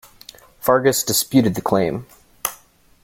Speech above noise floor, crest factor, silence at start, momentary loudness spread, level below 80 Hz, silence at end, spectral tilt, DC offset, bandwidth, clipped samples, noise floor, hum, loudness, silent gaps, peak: 33 dB; 20 dB; 0.65 s; 11 LU; -52 dBFS; 0.5 s; -4 dB/octave; under 0.1%; 17 kHz; under 0.1%; -50 dBFS; none; -19 LUFS; none; -2 dBFS